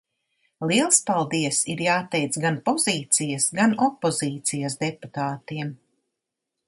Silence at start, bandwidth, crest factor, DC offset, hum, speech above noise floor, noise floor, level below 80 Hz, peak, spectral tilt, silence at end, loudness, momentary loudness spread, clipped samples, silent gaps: 0.6 s; 12 kHz; 22 dB; under 0.1%; none; 59 dB; -83 dBFS; -68 dBFS; -4 dBFS; -3.5 dB/octave; 0.9 s; -23 LUFS; 11 LU; under 0.1%; none